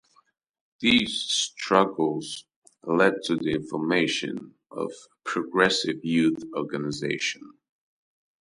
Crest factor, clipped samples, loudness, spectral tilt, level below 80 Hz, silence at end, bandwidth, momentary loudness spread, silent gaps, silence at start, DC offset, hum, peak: 22 dB; under 0.1%; -25 LUFS; -3.5 dB/octave; -64 dBFS; 0.95 s; 11.5 kHz; 14 LU; 2.56-2.62 s; 0.8 s; under 0.1%; none; -4 dBFS